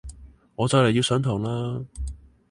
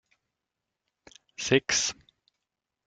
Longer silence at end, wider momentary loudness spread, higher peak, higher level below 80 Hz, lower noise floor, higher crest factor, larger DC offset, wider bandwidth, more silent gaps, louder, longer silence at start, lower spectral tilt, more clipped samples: second, 0.35 s vs 0.95 s; second, 18 LU vs 24 LU; about the same, -6 dBFS vs -8 dBFS; first, -40 dBFS vs -66 dBFS; second, -45 dBFS vs -86 dBFS; second, 20 dB vs 26 dB; neither; first, 11.5 kHz vs 10 kHz; neither; first, -23 LUFS vs -26 LUFS; second, 0.05 s vs 1.4 s; first, -5.5 dB/octave vs -2.5 dB/octave; neither